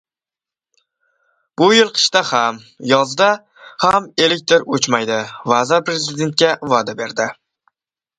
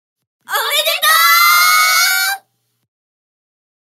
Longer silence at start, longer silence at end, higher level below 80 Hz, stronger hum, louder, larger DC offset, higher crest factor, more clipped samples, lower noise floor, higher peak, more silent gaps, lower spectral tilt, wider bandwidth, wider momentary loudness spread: first, 1.6 s vs 0.5 s; second, 0.85 s vs 1.6 s; first, -60 dBFS vs under -90 dBFS; neither; second, -16 LUFS vs -10 LUFS; neither; about the same, 18 dB vs 16 dB; neither; first, -90 dBFS vs -55 dBFS; about the same, 0 dBFS vs 0 dBFS; neither; first, -3 dB/octave vs 4.5 dB/octave; second, 11 kHz vs 16 kHz; about the same, 10 LU vs 11 LU